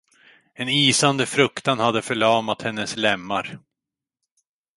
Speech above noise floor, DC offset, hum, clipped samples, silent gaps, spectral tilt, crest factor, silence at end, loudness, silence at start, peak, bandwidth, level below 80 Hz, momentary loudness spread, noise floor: 66 dB; under 0.1%; none; under 0.1%; none; -3.5 dB/octave; 20 dB; 1.2 s; -20 LUFS; 0.6 s; -2 dBFS; 11.5 kHz; -62 dBFS; 10 LU; -87 dBFS